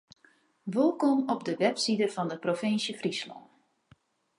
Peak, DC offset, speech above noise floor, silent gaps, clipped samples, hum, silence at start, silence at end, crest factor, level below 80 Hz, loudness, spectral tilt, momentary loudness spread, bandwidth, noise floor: -10 dBFS; under 0.1%; 36 dB; none; under 0.1%; none; 0.65 s; 1 s; 20 dB; -80 dBFS; -29 LUFS; -4.5 dB/octave; 8 LU; 11.5 kHz; -65 dBFS